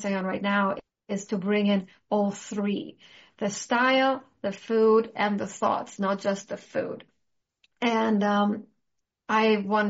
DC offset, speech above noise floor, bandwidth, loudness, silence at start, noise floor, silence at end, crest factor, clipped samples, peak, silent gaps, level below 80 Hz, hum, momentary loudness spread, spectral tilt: under 0.1%; 54 dB; 8 kHz; -26 LUFS; 0 s; -80 dBFS; 0 s; 18 dB; under 0.1%; -10 dBFS; none; -72 dBFS; none; 12 LU; -4 dB/octave